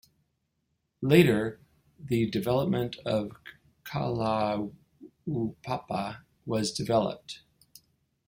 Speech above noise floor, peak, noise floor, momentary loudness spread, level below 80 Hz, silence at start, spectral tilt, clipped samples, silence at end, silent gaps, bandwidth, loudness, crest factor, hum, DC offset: 50 dB; -6 dBFS; -78 dBFS; 18 LU; -60 dBFS; 1 s; -6 dB/octave; under 0.1%; 0.9 s; none; 16.5 kHz; -29 LUFS; 24 dB; none; under 0.1%